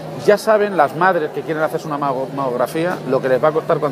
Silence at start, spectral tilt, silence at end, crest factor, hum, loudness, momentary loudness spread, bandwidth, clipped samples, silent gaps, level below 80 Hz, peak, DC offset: 0 s; -6 dB/octave; 0 s; 16 dB; none; -18 LUFS; 7 LU; 15.5 kHz; under 0.1%; none; -60 dBFS; 0 dBFS; under 0.1%